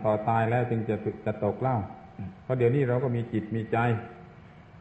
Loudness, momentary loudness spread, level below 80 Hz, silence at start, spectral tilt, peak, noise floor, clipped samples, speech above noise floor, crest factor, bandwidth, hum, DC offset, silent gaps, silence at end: -28 LUFS; 15 LU; -56 dBFS; 0 s; -10 dB/octave; -12 dBFS; -50 dBFS; under 0.1%; 23 dB; 16 dB; 8 kHz; none; under 0.1%; none; 0 s